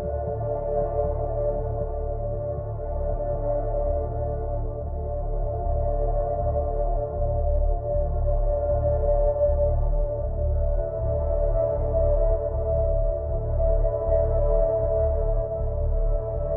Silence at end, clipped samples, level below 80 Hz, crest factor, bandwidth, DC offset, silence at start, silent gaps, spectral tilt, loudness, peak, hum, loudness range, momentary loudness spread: 0 s; under 0.1%; -26 dBFS; 12 dB; 2.1 kHz; under 0.1%; 0 s; none; -14 dB/octave; -26 LUFS; -10 dBFS; none; 4 LU; 7 LU